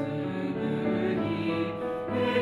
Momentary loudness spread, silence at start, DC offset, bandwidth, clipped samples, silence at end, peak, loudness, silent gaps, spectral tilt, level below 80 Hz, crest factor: 4 LU; 0 s; under 0.1%; 11 kHz; under 0.1%; 0 s; -14 dBFS; -30 LUFS; none; -8 dB/octave; -60 dBFS; 14 dB